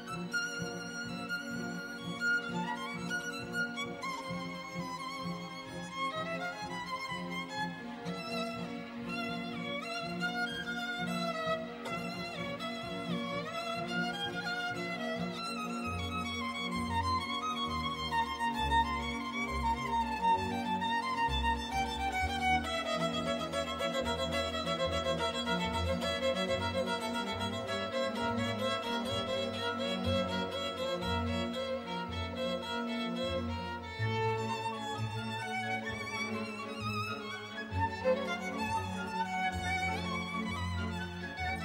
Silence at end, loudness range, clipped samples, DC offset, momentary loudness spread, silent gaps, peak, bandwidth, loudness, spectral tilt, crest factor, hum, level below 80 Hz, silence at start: 0 s; 5 LU; under 0.1%; under 0.1%; 7 LU; none; -18 dBFS; 16 kHz; -35 LUFS; -4.5 dB/octave; 16 dB; none; -52 dBFS; 0 s